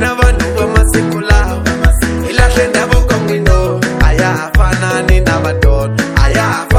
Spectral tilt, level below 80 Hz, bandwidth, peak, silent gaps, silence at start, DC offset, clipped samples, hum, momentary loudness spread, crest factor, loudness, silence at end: -5.5 dB/octave; -14 dBFS; 15.5 kHz; 0 dBFS; none; 0 s; under 0.1%; 0.9%; none; 3 LU; 10 dB; -12 LUFS; 0 s